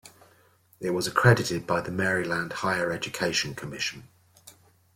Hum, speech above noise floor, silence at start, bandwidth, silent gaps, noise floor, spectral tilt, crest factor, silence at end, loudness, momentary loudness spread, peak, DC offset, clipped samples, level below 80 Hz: none; 35 dB; 0.05 s; 16.5 kHz; none; -61 dBFS; -4.5 dB/octave; 24 dB; 0.45 s; -26 LUFS; 11 LU; -4 dBFS; under 0.1%; under 0.1%; -60 dBFS